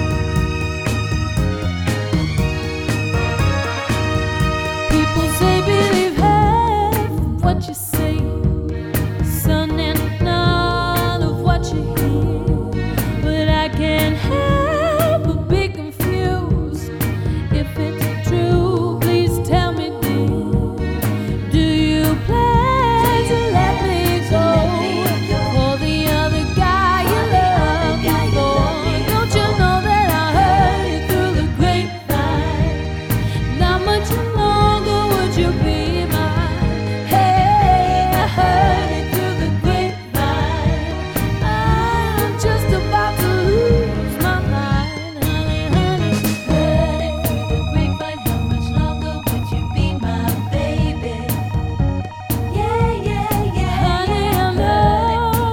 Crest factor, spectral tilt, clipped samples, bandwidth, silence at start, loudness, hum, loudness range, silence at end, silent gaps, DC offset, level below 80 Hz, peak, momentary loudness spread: 16 dB; -6 dB/octave; under 0.1%; 19.5 kHz; 0 s; -17 LUFS; none; 4 LU; 0 s; none; under 0.1%; -26 dBFS; 0 dBFS; 6 LU